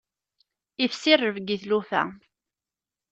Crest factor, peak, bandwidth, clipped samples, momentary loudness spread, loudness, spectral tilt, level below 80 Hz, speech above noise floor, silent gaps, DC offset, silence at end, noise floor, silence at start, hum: 22 dB; -4 dBFS; 8.2 kHz; under 0.1%; 11 LU; -24 LUFS; -4 dB/octave; -72 dBFS; over 66 dB; none; under 0.1%; 0.95 s; under -90 dBFS; 0.8 s; none